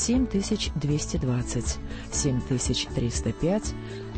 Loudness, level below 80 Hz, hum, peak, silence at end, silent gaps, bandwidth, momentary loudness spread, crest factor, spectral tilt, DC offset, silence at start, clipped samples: -27 LUFS; -36 dBFS; none; -12 dBFS; 0 s; none; 8.8 kHz; 6 LU; 14 dB; -5 dB/octave; under 0.1%; 0 s; under 0.1%